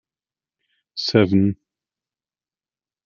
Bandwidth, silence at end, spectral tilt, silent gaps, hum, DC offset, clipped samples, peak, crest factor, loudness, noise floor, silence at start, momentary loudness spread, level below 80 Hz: 7 kHz; 1.55 s; -7 dB/octave; none; none; under 0.1%; under 0.1%; -2 dBFS; 22 dB; -19 LUFS; under -90 dBFS; 0.95 s; 18 LU; -62 dBFS